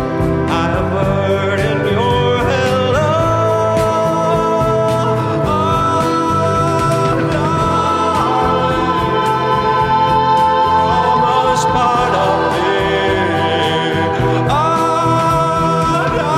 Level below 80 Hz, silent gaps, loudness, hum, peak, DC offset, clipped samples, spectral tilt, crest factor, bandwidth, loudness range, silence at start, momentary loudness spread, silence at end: -34 dBFS; none; -14 LUFS; none; -2 dBFS; under 0.1%; under 0.1%; -6 dB/octave; 12 dB; 16 kHz; 2 LU; 0 s; 3 LU; 0 s